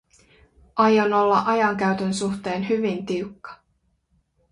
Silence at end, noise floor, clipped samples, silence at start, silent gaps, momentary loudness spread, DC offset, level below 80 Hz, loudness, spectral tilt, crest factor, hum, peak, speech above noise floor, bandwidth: 0.95 s; -69 dBFS; under 0.1%; 0.75 s; none; 13 LU; under 0.1%; -60 dBFS; -22 LUFS; -5.5 dB/octave; 18 dB; none; -6 dBFS; 47 dB; 11 kHz